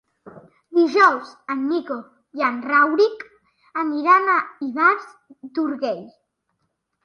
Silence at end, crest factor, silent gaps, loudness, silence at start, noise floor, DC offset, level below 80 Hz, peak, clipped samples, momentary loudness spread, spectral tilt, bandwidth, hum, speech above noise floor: 0.95 s; 20 dB; none; -20 LUFS; 0.25 s; -74 dBFS; under 0.1%; -76 dBFS; -2 dBFS; under 0.1%; 16 LU; -4.5 dB/octave; 10.5 kHz; none; 54 dB